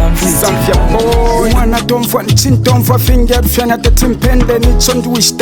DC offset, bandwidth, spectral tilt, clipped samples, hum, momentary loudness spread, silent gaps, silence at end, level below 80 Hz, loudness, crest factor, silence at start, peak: under 0.1%; 19.5 kHz; -4.5 dB/octave; under 0.1%; none; 2 LU; none; 0 s; -14 dBFS; -10 LUFS; 8 dB; 0 s; 0 dBFS